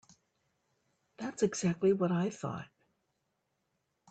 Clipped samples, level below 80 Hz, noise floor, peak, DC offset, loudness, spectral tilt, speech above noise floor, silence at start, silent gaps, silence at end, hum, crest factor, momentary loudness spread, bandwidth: under 0.1%; -72 dBFS; -81 dBFS; -18 dBFS; under 0.1%; -33 LUFS; -6 dB/octave; 50 dB; 1.2 s; none; 1.45 s; none; 20 dB; 14 LU; 9 kHz